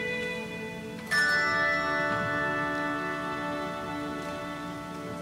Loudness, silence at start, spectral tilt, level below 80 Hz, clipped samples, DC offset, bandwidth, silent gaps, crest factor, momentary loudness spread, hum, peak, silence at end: -29 LUFS; 0 s; -4.5 dB/octave; -58 dBFS; under 0.1%; under 0.1%; 16 kHz; none; 16 dB; 13 LU; none; -14 dBFS; 0 s